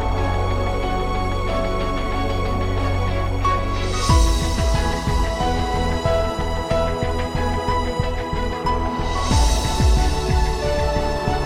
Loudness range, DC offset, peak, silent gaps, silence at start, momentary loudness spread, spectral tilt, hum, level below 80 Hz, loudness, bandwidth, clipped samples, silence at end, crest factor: 2 LU; under 0.1%; -4 dBFS; none; 0 s; 5 LU; -5.5 dB/octave; none; -24 dBFS; -21 LUFS; 15.5 kHz; under 0.1%; 0 s; 16 dB